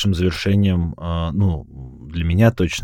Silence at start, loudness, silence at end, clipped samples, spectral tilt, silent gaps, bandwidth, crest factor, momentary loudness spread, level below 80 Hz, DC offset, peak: 0 s; -19 LUFS; 0 s; under 0.1%; -6.5 dB/octave; none; 14 kHz; 18 dB; 14 LU; -32 dBFS; under 0.1%; -2 dBFS